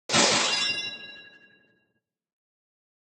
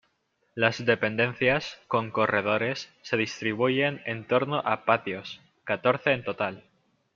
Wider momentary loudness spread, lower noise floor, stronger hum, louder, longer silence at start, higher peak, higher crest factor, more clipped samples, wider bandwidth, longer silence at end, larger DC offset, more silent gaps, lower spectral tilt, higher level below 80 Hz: first, 20 LU vs 10 LU; first, -78 dBFS vs -73 dBFS; neither; first, -23 LUFS vs -27 LUFS; second, 0.1 s vs 0.55 s; second, -8 dBFS vs -4 dBFS; about the same, 22 dB vs 22 dB; neither; first, 16.5 kHz vs 7.4 kHz; first, 1.8 s vs 0.55 s; neither; neither; second, -1 dB/octave vs -5.5 dB/octave; second, -72 dBFS vs -66 dBFS